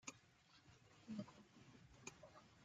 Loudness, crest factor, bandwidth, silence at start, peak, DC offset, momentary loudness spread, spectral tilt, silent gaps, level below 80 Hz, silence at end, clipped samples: -59 LUFS; 24 dB; 8.8 kHz; 0 s; -36 dBFS; under 0.1%; 15 LU; -4 dB/octave; none; -82 dBFS; 0 s; under 0.1%